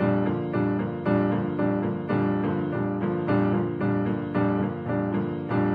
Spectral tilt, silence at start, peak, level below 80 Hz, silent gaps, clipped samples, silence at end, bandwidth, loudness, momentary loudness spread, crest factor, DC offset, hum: -11 dB/octave; 0 s; -10 dBFS; -54 dBFS; none; under 0.1%; 0 s; 4.9 kHz; -26 LUFS; 4 LU; 14 dB; under 0.1%; none